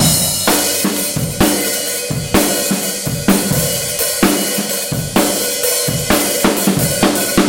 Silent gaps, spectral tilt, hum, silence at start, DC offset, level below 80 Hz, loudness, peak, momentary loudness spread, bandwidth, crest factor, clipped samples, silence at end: none; -3 dB/octave; none; 0 s; under 0.1%; -36 dBFS; -14 LUFS; 0 dBFS; 4 LU; 17 kHz; 16 dB; under 0.1%; 0 s